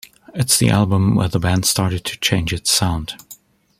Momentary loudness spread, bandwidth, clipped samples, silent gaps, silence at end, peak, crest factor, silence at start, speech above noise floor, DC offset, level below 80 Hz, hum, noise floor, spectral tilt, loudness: 11 LU; 16 kHz; under 0.1%; none; 0.45 s; 0 dBFS; 18 dB; 0.35 s; 28 dB; under 0.1%; -40 dBFS; none; -45 dBFS; -4 dB/octave; -17 LUFS